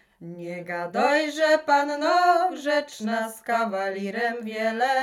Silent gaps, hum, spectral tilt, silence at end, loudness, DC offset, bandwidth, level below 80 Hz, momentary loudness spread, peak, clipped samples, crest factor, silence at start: none; none; -4 dB/octave; 0 s; -24 LUFS; under 0.1%; 16.5 kHz; -76 dBFS; 12 LU; -6 dBFS; under 0.1%; 18 dB; 0.2 s